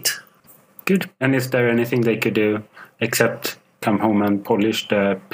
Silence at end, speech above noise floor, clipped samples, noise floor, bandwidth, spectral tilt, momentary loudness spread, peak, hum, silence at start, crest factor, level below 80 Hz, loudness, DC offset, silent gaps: 0.15 s; 32 dB; under 0.1%; -52 dBFS; 16 kHz; -5 dB/octave; 9 LU; 0 dBFS; none; 0 s; 20 dB; -66 dBFS; -20 LUFS; under 0.1%; none